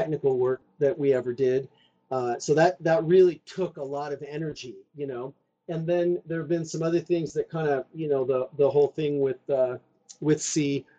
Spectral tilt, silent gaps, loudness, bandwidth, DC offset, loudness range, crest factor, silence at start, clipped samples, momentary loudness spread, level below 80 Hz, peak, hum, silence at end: -6 dB/octave; none; -26 LUFS; 9 kHz; under 0.1%; 6 LU; 18 dB; 0 s; under 0.1%; 12 LU; -66 dBFS; -8 dBFS; none; 0.15 s